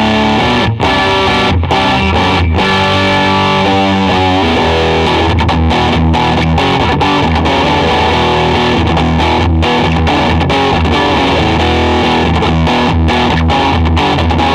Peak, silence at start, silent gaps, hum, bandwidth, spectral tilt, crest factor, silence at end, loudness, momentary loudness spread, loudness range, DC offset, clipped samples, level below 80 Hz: -4 dBFS; 0 s; none; none; 11 kHz; -6 dB/octave; 6 dB; 0 s; -10 LUFS; 1 LU; 0 LU; under 0.1%; under 0.1%; -22 dBFS